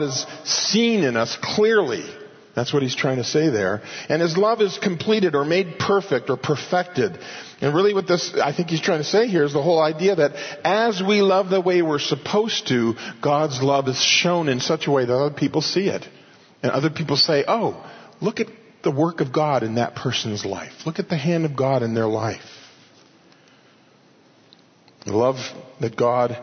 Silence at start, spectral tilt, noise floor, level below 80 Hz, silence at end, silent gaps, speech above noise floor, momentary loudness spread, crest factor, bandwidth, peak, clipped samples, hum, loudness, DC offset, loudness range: 0 s; -4.5 dB/octave; -54 dBFS; -66 dBFS; 0 s; none; 33 dB; 10 LU; 16 dB; 6.6 kHz; -4 dBFS; under 0.1%; none; -21 LUFS; under 0.1%; 6 LU